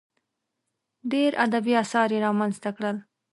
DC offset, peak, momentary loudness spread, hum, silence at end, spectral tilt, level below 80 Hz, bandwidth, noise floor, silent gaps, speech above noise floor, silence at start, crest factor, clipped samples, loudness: under 0.1%; -8 dBFS; 9 LU; none; 0.3 s; -5.5 dB/octave; -76 dBFS; 11.5 kHz; -81 dBFS; none; 57 dB; 1.05 s; 18 dB; under 0.1%; -25 LUFS